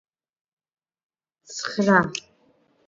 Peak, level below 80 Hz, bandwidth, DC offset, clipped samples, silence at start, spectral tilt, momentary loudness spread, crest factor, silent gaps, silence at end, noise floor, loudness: -4 dBFS; -64 dBFS; 7.8 kHz; under 0.1%; under 0.1%; 1.5 s; -5 dB/octave; 16 LU; 24 dB; none; 0.7 s; -63 dBFS; -22 LUFS